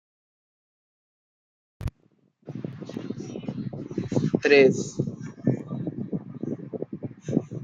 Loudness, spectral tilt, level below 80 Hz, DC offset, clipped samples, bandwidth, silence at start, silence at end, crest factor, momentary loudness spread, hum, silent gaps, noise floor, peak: -27 LUFS; -6.5 dB/octave; -54 dBFS; under 0.1%; under 0.1%; 7.8 kHz; 1.8 s; 0 s; 24 dB; 19 LU; none; none; -65 dBFS; -4 dBFS